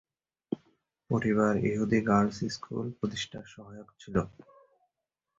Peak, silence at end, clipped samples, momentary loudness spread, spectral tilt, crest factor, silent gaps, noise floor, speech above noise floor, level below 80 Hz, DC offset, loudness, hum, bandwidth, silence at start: -12 dBFS; 1.1 s; under 0.1%; 20 LU; -6.5 dB/octave; 20 dB; none; -86 dBFS; 56 dB; -58 dBFS; under 0.1%; -30 LUFS; none; 7.8 kHz; 0.5 s